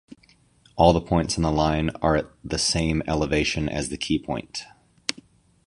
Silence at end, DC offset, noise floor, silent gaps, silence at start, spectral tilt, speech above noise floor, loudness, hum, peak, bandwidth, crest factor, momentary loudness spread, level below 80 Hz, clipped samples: 0.45 s; under 0.1%; -59 dBFS; none; 0.1 s; -5 dB/octave; 36 dB; -24 LUFS; none; -2 dBFS; 11.5 kHz; 22 dB; 12 LU; -38 dBFS; under 0.1%